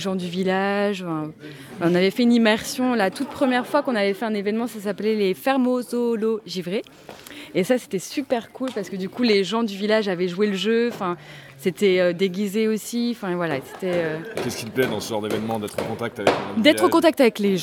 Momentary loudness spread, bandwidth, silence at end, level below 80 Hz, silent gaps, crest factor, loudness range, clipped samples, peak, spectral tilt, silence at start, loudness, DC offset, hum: 10 LU; 17.5 kHz; 0 s; -66 dBFS; none; 20 dB; 4 LU; under 0.1%; -2 dBFS; -5 dB/octave; 0 s; -22 LUFS; under 0.1%; none